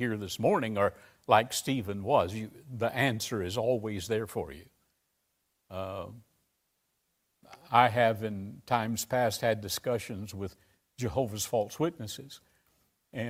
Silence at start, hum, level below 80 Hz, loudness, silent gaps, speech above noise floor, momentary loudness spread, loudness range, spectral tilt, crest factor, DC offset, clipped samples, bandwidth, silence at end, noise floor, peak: 0 s; none; -62 dBFS; -30 LUFS; none; 48 dB; 16 LU; 8 LU; -4.5 dB/octave; 26 dB; under 0.1%; under 0.1%; 16 kHz; 0 s; -78 dBFS; -6 dBFS